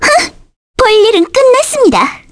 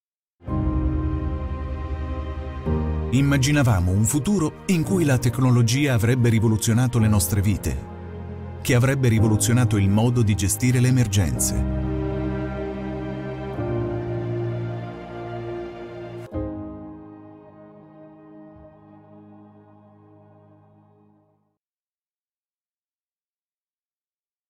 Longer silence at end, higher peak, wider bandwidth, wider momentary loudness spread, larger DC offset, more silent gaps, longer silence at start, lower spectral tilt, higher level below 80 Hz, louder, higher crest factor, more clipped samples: second, 0.15 s vs 5.05 s; first, 0 dBFS vs -8 dBFS; second, 11 kHz vs 16 kHz; second, 7 LU vs 16 LU; neither; first, 0.56-0.74 s vs none; second, 0 s vs 0.45 s; second, -2.5 dB/octave vs -6 dB/octave; about the same, -36 dBFS vs -36 dBFS; first, -9 LUFS vs -22 LUFS; second, 10 dB vs 16 dB; neither